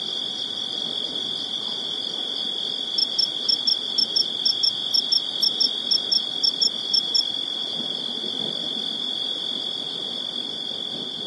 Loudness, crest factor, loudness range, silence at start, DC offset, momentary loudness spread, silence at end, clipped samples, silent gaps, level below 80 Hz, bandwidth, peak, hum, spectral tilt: -22 LUFS; 16 dB; 6 LU; 0 s; under 0.1%; 7 LU; 0 s; under 0.1%; none; -76 dBFS; 12 kHz; -8 dBFS; none; -1.5 dB/octave